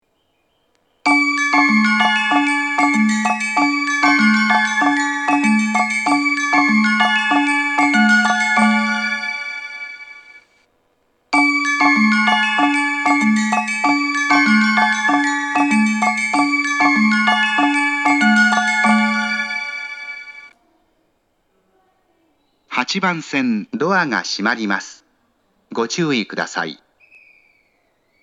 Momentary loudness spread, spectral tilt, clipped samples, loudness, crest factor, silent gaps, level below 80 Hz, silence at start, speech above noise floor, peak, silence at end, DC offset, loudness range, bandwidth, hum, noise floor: 10 LU; -3.5 dB/octave; under 0.1%; -15 LUFS; 18 dB; none; -74 dBFS; 1.05 s; 47 dB; 0 dBFS; 1.5 s; under 0.1%; 9 LU; 11 kHz; none; -65 dBFS